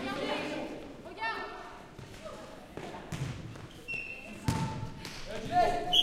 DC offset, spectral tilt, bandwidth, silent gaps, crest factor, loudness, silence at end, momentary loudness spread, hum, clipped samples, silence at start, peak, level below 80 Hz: under 0.1%; -4 dB/octave; 16.5 kHz; none; 22 dB; -36 LUFS; 0 s; 17 LU; none; under 0.1%; 0 s; -12 dBFS; -52 dBFS